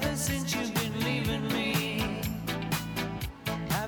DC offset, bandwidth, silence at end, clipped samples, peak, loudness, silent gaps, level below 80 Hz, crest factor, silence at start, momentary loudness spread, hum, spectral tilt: under 0.1%; over 20 kHz; 0 s; under 0.1%; -14 dBFS; -31 LUFS; none; -46 dBFS; 16 dB; 0 s; 6 LU; none; -4.5 dB/octave